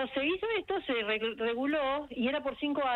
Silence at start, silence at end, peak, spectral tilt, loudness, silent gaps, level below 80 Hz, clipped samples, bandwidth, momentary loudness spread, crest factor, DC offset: 0 s; 0 s; -20 dBFS; -6 dB/octave; -32 LUFS; none; -62 dBFS; under 0.1%; 4.4 kHz; 3 LU; 12 dB; under 0.1%